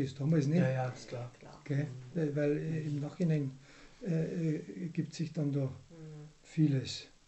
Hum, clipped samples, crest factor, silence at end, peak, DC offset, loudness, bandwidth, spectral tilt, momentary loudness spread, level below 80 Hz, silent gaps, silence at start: none; under 0.1%; 16 dB; 0.2 s; -18 dBFS; under 0.1%; -35 LUFS; 8.4 kHz; -7.5 dB/octave; 18 LU; -66 dBFS; none; 0 s